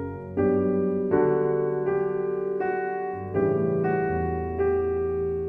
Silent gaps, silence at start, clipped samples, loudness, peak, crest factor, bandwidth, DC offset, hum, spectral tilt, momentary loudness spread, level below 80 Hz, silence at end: none; 0 s; under 0.1%; -25 LUFS; -10 dBFS; 16 dB; 3 kHz; under 0.1%; none; -11.5 dB/octave; 5 LU; -46 dBFS; 0 s